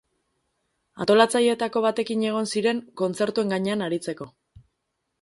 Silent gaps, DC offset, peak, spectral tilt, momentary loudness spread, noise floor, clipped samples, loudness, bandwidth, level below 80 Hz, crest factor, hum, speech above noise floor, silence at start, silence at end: none; under 0.1%; -4 dBFS; -4.5 dB/octave; 11 LU; -78 dBFS; under 0.1%; -24 LUFS; 11.5 kHz; -66 dBFS; 22 dB; none; 55 dB; 0.95 s; 0.95 s